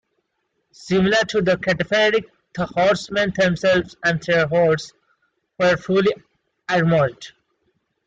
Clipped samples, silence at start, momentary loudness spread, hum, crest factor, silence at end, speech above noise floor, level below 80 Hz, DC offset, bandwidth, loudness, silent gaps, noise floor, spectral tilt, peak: under 0.1%; 0.8 s; 11 LU; none; 14 dB; 0.8 s; 54 dB; -52 dBFS; under 0.1%; 9.2 kHz; -19 LUFS; none; -73 dBFS; -5.5 dB/octave; -6 dBFS